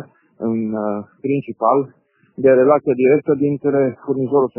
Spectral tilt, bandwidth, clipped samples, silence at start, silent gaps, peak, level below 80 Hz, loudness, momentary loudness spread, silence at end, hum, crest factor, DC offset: -9 dB/octave; 3.1 kHz; under 0.1%; 0 s; none; -2 dBFS; -62 dBFS; -17 LUFS; 10 LU; 0.1 s; none; 16 dB; under 0.1%